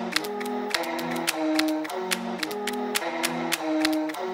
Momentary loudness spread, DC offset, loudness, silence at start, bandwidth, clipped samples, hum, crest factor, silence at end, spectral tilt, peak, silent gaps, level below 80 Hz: 5 LU; under 0.1%; -27 LUFS; 0 s; 16.5 kHz; under 0.1%; none; 22 dB; 0 s; -2.5 dB/octave; -6 dBFS; none; -68 dBFS